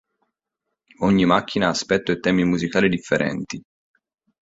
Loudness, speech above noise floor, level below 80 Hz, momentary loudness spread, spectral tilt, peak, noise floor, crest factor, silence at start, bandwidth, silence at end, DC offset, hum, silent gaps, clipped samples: -20 LUFS; 61 dB; -52 dBFS; 8 LU; -5.5 dB/octave; -2 dBFS; -81 dBFS; 20 dB; 1 s; 8 kHz; 0.8 s; under 0.1%; none; none; under 0.1%